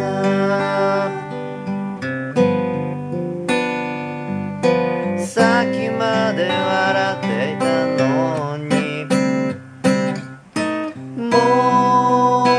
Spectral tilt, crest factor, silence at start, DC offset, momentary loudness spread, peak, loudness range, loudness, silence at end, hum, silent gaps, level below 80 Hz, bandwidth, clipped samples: -6 dB/octave; 18 dB; 0 s; under 0.1%; 11 LU; 0 dBFS; 3 LU; -19 LUFS; 0 s; none; none; -64 dBFS; 11 kHz; under 0.1%